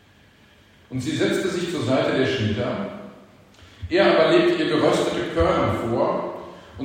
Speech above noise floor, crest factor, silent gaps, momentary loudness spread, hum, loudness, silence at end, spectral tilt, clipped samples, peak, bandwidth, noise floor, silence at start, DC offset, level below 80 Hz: 33 dB; 18 dB; none; 16 LU; none; -21 LUFS; 0 s; -5.5 dB/octave; under 0.1%; -4 dBFS; 16 kHz; -53 dBFS; 0.9 s; under 0.1%; -46 dBFS